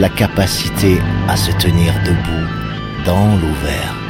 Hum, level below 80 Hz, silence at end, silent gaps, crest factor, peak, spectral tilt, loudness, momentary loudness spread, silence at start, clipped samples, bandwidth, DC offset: none; -26 dBFS; 0 s; none; 14 dB; 0 dBFS; -5.5 dB/octave; -15 LUFS; 7 LU; 0 s; under 0.1%; 16.5 kHz; under 0.1%